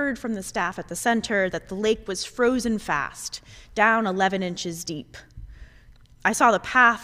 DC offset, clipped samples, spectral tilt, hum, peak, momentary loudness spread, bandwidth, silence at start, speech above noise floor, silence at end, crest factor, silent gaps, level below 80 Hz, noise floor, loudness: under 0.1%; under 0.1%; -3.5 dB/octave; none; -4 dBFS; 15 LU; 16 kHz; 0 s; 27 dB; 0 s; 20 dB; none; -50 dBFS; -51 dBFS; -24 LUFS